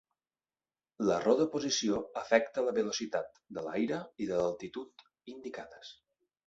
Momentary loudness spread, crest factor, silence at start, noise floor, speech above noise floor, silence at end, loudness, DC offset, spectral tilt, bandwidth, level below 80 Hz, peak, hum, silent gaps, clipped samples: 17 LU; 22 dB; 1 s; under -90 dBFS; over 57 dB; 0.55 s; -32 LUFS; under 0.1%; -4 dB/octave; 8 kHz; -70 dBFS; -12 dBFS; none; none; under 0.1%